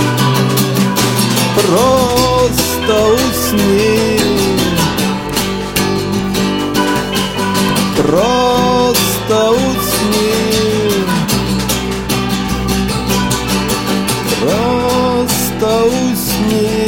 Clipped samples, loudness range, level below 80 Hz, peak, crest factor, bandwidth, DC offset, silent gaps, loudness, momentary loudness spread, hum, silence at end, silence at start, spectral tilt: under 0.1%; 3 LU; -32 dBFS; 0 dBFS; 12 dB; 17 kHz; under 0.1%; none; -13 LUFS; 4 LU; none; 0 s; 0 s; -4.5 dB/octave